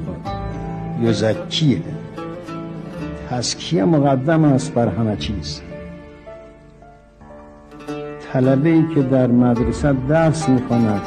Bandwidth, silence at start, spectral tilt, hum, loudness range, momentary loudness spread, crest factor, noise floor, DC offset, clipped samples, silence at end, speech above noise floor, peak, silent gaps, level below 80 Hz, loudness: 9.8 kHz; 0 s; -6.5 dB/octave; none; 9 LU; 15 LU; 14 dB; -44 dBFS; under 0.1%; under 0.1%; 0 s; 28 dB; -6 dBFS; none; -38 dBFS; -18 LUFS